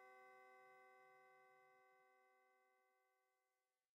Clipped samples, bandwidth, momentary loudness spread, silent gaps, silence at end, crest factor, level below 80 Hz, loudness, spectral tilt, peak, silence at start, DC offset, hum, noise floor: under 0.1%; 7.6 kHz; 3 LU; none; 0.2 s; 16 dB; under -90 dBFS; -68 LUFS; -1 dB/octave; -56 dBFS; 0 s; under 0.1%; none; under -90 dBFS